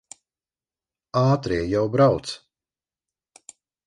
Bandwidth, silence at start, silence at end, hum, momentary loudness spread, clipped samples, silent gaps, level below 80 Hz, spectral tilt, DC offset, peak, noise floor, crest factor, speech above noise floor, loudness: 11 kHz; 1.15 s; 1.5 s; none; 13 LU; under 0.1%; none; -50 dBFS; -7 dB/octave; under 0.1%; -4 dBFS; under -90 dBFS; 22 dB; over 70 dB; -22 LUFS